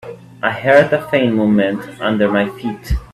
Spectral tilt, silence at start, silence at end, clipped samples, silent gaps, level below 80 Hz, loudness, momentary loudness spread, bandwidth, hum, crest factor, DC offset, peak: -7 dB/octave; 0.05 s; 0.1 s; under 0.1%; none; -32 dBFS; -16 LUFS; 11 LU; 13 kHz; none; 16 dB; under 0.1%; 0 dBFS